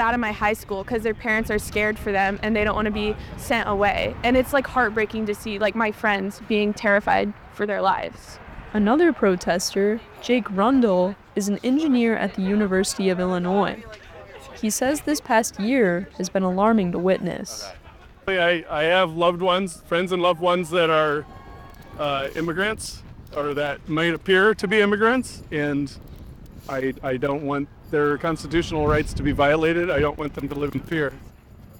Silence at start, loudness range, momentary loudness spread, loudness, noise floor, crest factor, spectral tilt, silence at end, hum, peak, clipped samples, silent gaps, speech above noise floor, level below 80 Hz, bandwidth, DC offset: 0 s; 3 LU; 11 LU; -22 LUFS; -46 dBFS; 16 dB; -5 dB/octave; 0 s; none; -6 dBFS; under 0.1%; none; 24 dB; -42 dBFS; 18.5 kHz; under 0.1%